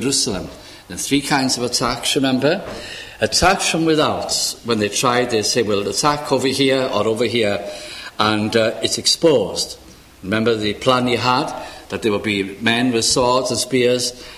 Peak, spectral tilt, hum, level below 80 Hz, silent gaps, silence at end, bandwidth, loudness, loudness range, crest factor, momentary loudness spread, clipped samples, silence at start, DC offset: 0 dBFS; -3 dB/octave; none; -44 dBFS; none; 0 s; 16 kHz; -18 LUFS; 2 LU; 18 dB; 12 LU; under 0.1%; 0 s; under 0.1%